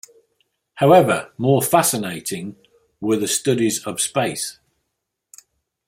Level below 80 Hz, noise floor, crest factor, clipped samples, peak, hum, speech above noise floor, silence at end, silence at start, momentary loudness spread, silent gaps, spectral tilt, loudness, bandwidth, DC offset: -62 dBFS; -78 dBFS; 20 dB; under 0.1%; -2 dBFS; none; 59 dB; 1.35 s; 0.75 s; 14 LU; none; -4.5 dB/octave; -19 LUFS; 16.5 kHz; under 0.1%